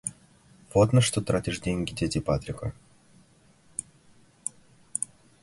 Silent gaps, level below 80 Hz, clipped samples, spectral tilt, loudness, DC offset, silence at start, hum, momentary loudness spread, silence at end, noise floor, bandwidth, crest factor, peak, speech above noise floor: none; -48 dBFS; under 0.1%; -5 dB/octave; -28 LUFS; under 0.1%; 0.05 s; none; 16 LU; 0.4 s; -59 dBFS; 11.5 kHz; 22 dB; -6 dBFS; 34 dB